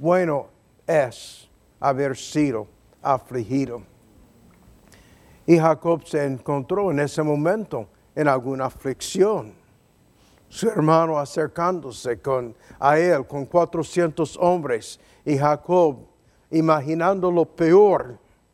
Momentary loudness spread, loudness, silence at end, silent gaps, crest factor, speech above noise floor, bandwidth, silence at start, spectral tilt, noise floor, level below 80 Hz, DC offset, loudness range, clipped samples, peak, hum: 14 LU; -22 LUFS; 0.4 s; none; 20 dB; 37 dB; 14 kHz; 0 s; -6.5 dB/octave; -58 dBFS; -58 dBFS; under 0.1%; 5 LU; under 0.1%; -2 dBFS; none